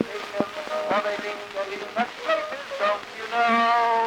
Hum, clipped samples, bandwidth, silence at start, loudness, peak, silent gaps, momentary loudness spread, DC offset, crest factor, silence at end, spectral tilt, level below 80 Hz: none; under 0.1%; 17.5 kHz; 0 s; -25 LUFS; -6 dBFS; none; 11 LU; under 0.1%; 18 dB; 0 s; -3.5 dB/octave; -68 dBFS